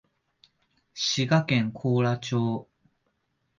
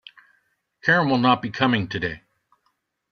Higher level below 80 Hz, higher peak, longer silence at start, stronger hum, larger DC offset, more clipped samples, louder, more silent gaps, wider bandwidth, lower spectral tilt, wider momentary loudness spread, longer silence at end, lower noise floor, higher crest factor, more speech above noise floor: second, -66 dBFS vs -58 dBFS; second, -10 dBFS vs -2 dBFS; about the same, 0.95 s vs 0.85 s; neither; neither; neither; second, -26 LUFS vs -21 LUFS; neither; first, 7.4 kHz vs 6.6 kHz; about the same, -5.5 dB/octave vs -6.5 dB/octave; second, 8 LU vs 11 LU; about the same, 0.95 s vs 0.95 s; about the same, -75 dBFS vs -72 dBFS; about the same, 18 dB vs 22 dB; about the same, 50 dB vs 51 dB